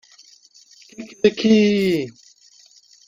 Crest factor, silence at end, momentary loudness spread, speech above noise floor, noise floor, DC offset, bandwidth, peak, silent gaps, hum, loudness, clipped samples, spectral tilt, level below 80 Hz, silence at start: 20 dB; 1 s; 22 LU; 34 dB; -52 dBFS; under 0.1%; 15.5 kHz; -2 dBFS; none; none; -18 LUFS; under 0.1%; -6 dB/octave; -60 dBFS; 1 s